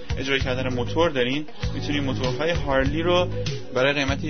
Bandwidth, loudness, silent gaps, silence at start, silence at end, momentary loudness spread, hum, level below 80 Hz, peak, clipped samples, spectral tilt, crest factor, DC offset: 6.6 kHz; -24 LUFS; none; 0 s; 0 s; 6 LU; none; -36 dBFS; -8 dBFS; under 0.1%; -5.5 dB/octave; 16 dB; 2%